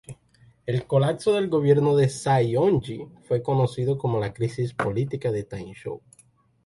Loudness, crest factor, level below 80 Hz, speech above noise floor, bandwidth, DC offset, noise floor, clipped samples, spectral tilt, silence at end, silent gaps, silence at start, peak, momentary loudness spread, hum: -24 LUFS; 18 dB; -56 dBFS; 34 dB; 11.5 kHz; under 0.1%; -57 dBFS; under 0.1%; -7 dB/octave; 0.7 s; none; 0.1 s; -6 dBFS; 16 LU; none